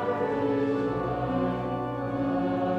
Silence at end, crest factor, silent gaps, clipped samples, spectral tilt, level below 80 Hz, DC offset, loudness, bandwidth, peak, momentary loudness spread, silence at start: 0 s; 12 dB; none; under 0.1%; -9 dB/octave; -50 dBFS; under 0.1%; -28 LUFS; 6.8 kHz; -16 dBFS; 4 LU; 0 s